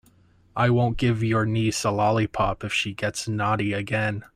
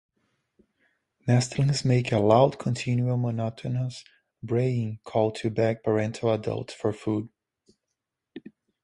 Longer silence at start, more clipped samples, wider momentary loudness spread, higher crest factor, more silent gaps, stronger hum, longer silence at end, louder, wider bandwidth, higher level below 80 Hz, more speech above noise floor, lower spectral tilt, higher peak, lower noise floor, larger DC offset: second, 0.55 s vs 1.25 s; neither; second, 5 LU vs 13 LU; about the same, 16 dB vs 20 dB; neither; neither; second, 0.1 s vs 0.45 s; about the same, -24 LUFS vs -26 LUFS; first, 14.5 kHz vs 11 kHz; first, -46 dBFS vs -60 dBFS; second, 34 dB vs 59 dB; about the same, -5.5 dB/octave vs -6.5 dB/octave; about the same, -8 dBFS vs -6 dBFS; second, -58 dBFS vs -84 dBFS; neither